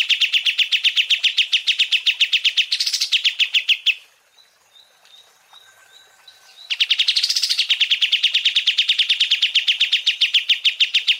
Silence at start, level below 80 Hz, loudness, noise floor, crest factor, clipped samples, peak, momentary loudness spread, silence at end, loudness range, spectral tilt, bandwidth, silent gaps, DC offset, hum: 0 s; under -90 dBFS; -16 LUFS; -55 dBFS; 16 dB; under 0.1%; -4 dBFS; 2 LU; 0 s; 7 LU; 7.5 dB/octave; 16 kHz; none; under 0.1%; none